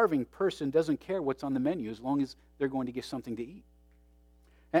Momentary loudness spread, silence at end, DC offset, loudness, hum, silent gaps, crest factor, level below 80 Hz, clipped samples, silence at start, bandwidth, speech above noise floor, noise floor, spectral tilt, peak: 10 LU; 0 s; under 0.1%; -33 LUFS; none; none; 20 dB; -62 dBFS; under 0.1%; 0 s; 14 kHz; 30 dB; -61 dBFS; -7 dB/octave; -12 dBFS